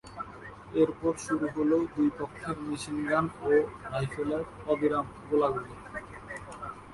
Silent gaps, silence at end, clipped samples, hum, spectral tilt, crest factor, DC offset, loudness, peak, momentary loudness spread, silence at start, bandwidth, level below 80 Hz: none; 0 s; under 0.1%; none; -6.5 dB/octave; 18 dB; under 0.1%; -30 LUFS; -14 dBFS; 15 LU; 0.05 s; 11.5 kHz; -56 dBFS